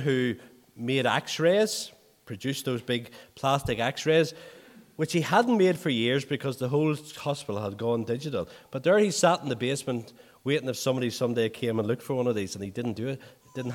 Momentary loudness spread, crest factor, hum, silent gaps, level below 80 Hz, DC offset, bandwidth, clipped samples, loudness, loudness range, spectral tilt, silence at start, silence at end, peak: 12 LU; 20 dB; none; none; -62 dBFS; under 0.1%; 17.5 kHz; under 0.1%; -27 LUFS; 3 LU; -5 dB/octave; 0 s; 0 s; -8 dBFS